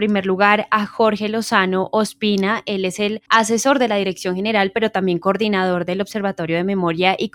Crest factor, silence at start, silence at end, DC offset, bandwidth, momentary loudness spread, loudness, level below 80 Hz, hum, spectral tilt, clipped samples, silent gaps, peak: 16 dB; 0 s; 0.05 s; under 0.1%; 17.5 kHz; 6 LU; -18 LUFS; -60 dBFS; none; -4.5 dB/octave; under 0.1%; none; -2 dBFS